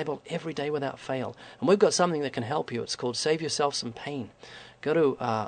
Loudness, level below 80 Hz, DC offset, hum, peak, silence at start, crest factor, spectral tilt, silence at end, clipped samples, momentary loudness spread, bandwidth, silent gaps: -28 LUFS; -68 dBFS; under 0.1%; none; -8 dBFS; 0 s; 20 dB; -4.5 dB/octave; 0 s; under 0.1%; 13 LU; 9.4 kHz; none